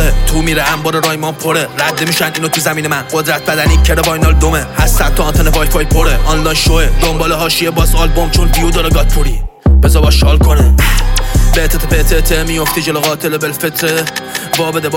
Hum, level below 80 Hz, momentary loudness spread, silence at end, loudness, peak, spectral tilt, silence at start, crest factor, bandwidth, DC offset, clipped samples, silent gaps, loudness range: none; -12 dBFS; 6 LU; 0 s; -12 LUFS; 0 dBFS; -4.5 dB/octave; 0 s; 10 dB; 17 kHz; under 0.1%; under 0.1%; none; 2 LU